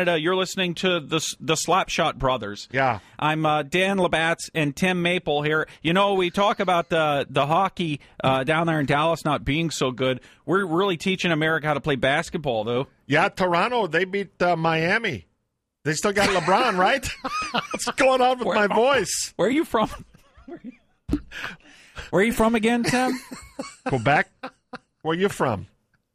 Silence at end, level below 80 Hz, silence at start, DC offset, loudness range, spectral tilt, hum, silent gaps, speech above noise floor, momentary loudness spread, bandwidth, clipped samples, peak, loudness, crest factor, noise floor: 0.5 s; -48 dBFS; 0 s; under 0.1%; 3 LU; -4.5 dB/octave; none; none; 54 dB; 10 LU; 15.5 kHz; under 0.1%; -8 dBFS; -23 LUFS; 14 dB; -77 dBFS